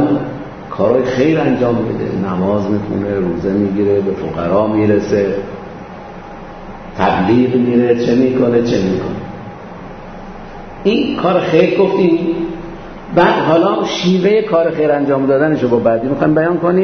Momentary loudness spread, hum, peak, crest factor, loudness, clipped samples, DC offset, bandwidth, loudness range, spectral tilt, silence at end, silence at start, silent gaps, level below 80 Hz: 19 LU; none; 0 dBFS; 14 dB; -14 LUFS; under 0.1%; under 0.1%; 6.6 kHz; 4 LU; -7.5 dB/octave; 0 s; 0 s; none; -40 dBFS